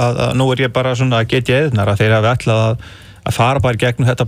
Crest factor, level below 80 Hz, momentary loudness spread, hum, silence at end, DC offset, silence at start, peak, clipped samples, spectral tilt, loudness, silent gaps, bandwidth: 12 dB; -40 dBFS; 4 LU; none; 0 s; under 0.1%; 0 s; -2 dBFS; under 0.1%; -6 dB/octave; -14 LUFS; none; 15 kHz